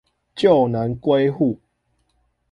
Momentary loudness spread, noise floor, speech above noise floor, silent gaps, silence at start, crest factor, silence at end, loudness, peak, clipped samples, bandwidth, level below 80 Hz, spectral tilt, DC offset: 13 LU; -68 dBFS; 50 dB; none; 0.35 s; 18 dB; 0.95 s; -19 LUFS; -4 dBFS; under 0.1%; 10 kHz; -54 dBFS; -8 dB/octave; under 0.1%